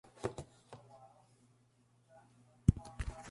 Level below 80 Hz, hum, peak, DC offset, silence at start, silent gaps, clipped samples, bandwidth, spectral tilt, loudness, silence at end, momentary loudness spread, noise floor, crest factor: -48 dBFS; none; -10 dBFS; under 0.1%; 0.25 s; none; under 0.1%; 11.5 kHz; -7.5 dB/octave; -38 LUFS; 0 s; 25 LU; -71 dBFS; 30 dB